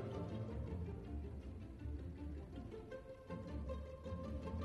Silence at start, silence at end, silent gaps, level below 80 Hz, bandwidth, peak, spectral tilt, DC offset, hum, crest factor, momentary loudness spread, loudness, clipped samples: 0 s; 0 s; none; -52 dBFS; 9.2 kHz; -32 dBFS; -8.5 dB/octave; under 0.1%; none; 14 dB; 6 LU; -49 LUFS; under 0.1%